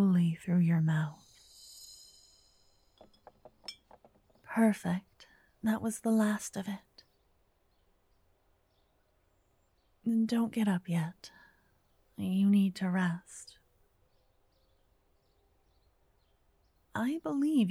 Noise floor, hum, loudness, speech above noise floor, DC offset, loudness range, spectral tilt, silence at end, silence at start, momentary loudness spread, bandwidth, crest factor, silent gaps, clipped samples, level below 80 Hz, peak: -72 dBFS; none; -32 LUFS; 42 dB; under 0.1%; 13 LU; -6.5 dB/octave; 0 s; 0 s; 22 LU; 14.5 kHz; 20 dB; none; under 0.1%; -74 dBFS; -16 dBFS